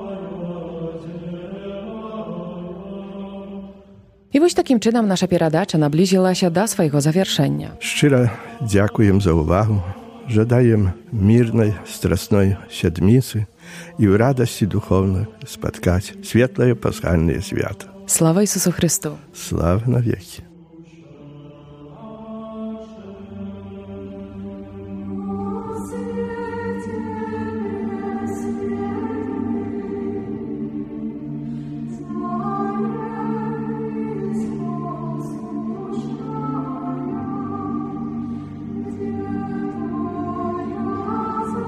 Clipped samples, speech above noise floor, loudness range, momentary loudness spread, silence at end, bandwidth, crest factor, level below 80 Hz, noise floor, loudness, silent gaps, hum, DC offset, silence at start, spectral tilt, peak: under 0.1%; 30 dB; 13 LU; 17 LU; 0 s; 15.5 kHz; 20 dB; -46 dBFS; -47 dBFS; -21 LUFS; none; none; under 0.1%; 0 s; -6 dB/octave; 0 dBFS